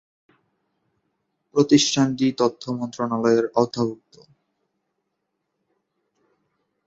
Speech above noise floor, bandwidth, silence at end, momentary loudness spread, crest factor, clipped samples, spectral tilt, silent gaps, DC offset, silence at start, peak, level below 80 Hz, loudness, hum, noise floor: 57 dB; 8 kHz; 2.9 s; 10 LU; 22 dB; under 0.1%; -4.5 dB/octave; none; under 0.1%; 1.55 s; -2 dBFS; -66 dBFS; -21 LUFS; none; -77 dBFS